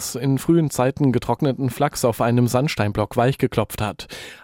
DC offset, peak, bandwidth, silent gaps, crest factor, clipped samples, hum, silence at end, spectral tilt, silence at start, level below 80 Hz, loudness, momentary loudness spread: under 0.1%; -6 dBFS; 17 kHz; none; 14 dB; under 0.1%; none; 0.1 s; -6 dB/octave; 0 s; -46 dBFS; -21 LUFS; 7 LU